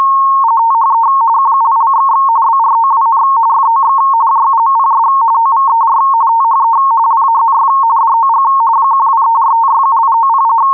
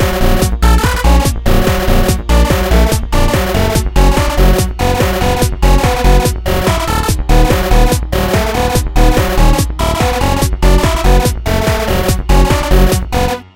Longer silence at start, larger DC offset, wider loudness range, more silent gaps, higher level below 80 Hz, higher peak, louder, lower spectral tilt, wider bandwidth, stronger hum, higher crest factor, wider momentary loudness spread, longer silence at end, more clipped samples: about the same, 0 s vs 0 s; neither; about the same, 0 LU vs 1 LU; neither; second, -64 dBFS vs -12 dBFS; second, -6 dBFS vs 0 dBFS; first, -9 LUFS vs -13 LUFS; about the same, -5.5 dB/octave vs -5 dB/octave; second, 2.5 kHz vs 17 kHz; neither; second, 4 dB vs 10 dB; second, 0 LU vs 3 LU; second, 0 s vs 0.15 s; neither